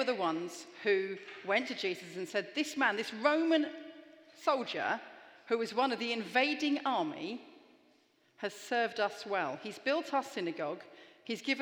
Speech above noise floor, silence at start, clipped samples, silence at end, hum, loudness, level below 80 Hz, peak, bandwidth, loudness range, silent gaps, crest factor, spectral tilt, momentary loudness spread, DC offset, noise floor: 35 dB; 0 s; under 0.1%; 0 s; none; -34 LUFS; under -90 dBFS; -14 dBFS; 19.5 kHz; 3 LU; none; 20 dB; -3.5 dB/octave; 12 LU; under 0.1%; -69 dBFS